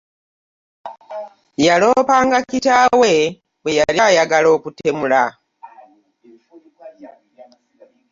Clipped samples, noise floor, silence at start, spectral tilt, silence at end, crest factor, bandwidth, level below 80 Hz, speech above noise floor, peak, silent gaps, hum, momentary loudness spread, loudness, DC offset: under 0.1%; -52 dBFS; 0.85 s; -3.5 dB/octave; 1.05 s; 16 dB; 7.6 kHz; -56 dBFS; 38 dB; -2 dBFS; none; none; 20 LU; -15 LUFS; under 0.1%